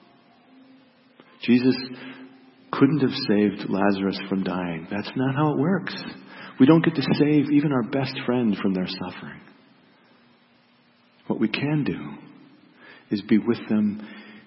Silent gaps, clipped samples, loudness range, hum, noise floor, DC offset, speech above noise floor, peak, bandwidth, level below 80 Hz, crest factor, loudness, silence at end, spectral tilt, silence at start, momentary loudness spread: none; under 0.1%; 9 LU; none; -59 dBFS; under 0.1%; 37 dB; -4 dBFS; 5.8 kHz; -66 dBFS; 20 dB; -23 LUFS; 0.05 s; -11 dB/octave; 1.4 s; 18 LU